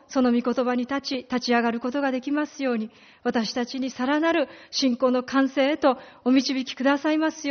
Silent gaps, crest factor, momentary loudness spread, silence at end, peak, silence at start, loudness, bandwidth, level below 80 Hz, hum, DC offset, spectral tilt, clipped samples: none; 16 dB; 6 LU; 0 s; -8 dBFS; 0.1 s; -24 LUFS; 6.6 kHz; -66 dBFS; none; under 0.1%; -2 dB/octave; under 0.1%